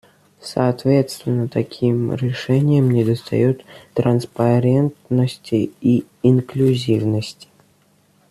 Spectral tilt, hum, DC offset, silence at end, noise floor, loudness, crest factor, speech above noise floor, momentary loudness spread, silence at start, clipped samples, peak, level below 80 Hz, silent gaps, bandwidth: -8 dB/octave; none; under 0.1%; 1 s; -57 dBFS; -19 LUFS; 16 dB; 40 dB; 7 LU; 0.45 s; under 0.1%; -2 dBFS; -56 dBFS; none; 13 kHz